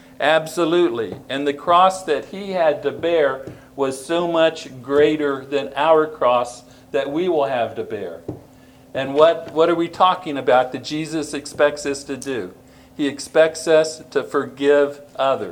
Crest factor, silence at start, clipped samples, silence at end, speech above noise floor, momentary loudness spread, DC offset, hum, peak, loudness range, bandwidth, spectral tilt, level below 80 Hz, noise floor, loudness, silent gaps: 20 dB; 0.2 s; under 0.1%; 0 s; 28 dB; 12 LU; under 0.1%; none; 0 dBFS; 3 LU; 17.5 kHz; -4.5 dB/octave; -58 dBFS; -47 dBFS; -19 LUFS; none